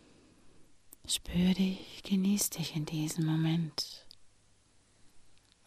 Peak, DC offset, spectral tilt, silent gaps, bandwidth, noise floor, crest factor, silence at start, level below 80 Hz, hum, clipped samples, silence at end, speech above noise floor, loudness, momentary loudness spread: -18 dBFS; under 0.1%; -4.5 dB/octave; none; 15.5 kHz; -66 dBFS; 18 dB; 0.45 s; -58 dBFS; none; under 0.1%; 0.35 s; 34 dB; -32 LUFS; 11 LU